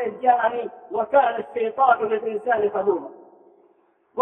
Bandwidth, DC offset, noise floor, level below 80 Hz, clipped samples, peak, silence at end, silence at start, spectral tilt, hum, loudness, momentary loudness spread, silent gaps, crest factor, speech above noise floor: 3.8 kHz; under 0.1%; -61 dBFS; -72 dBFS; under 0.1%; -6 dBFS; 0 s; 0 s; -7.5 dB/octave; none; -22 LUFS; 11 LU; none; 18 dB; 40 dB